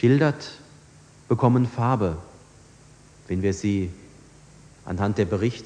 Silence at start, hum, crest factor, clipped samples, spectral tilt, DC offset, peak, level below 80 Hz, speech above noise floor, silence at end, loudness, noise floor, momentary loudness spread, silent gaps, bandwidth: 0 s; none; 18 dB; under 0.1%; -7.5 dB/octave; under 0.1%; -6 dBFS; -52 dBFS; 29 dB; 0 s; -24 LUFS; -51 dBFS; 18 LU; none; 9.8 kHz